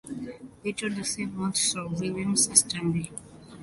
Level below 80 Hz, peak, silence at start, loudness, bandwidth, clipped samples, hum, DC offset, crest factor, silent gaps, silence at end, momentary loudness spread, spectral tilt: -58 dBFS; -2 dBFS; 0.05 s; -26 LUFS; 12 kHz; under 0.1%; none; under 0.1%; 26 dB; none; 0 s; 18 LU; -3 dB/octave